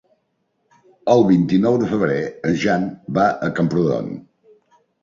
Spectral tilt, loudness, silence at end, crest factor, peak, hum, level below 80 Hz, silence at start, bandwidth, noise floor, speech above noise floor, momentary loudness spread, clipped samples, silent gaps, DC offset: -7.5 dB/octave; -18 LUFS; 0.8 s; 18 dB; -2 dBFS; none; -54 dBFS; 1.05 s; 7.4 kHz; -69 dBFS; 52 dB; 10 LU; under 0.1%; none; under 0.1%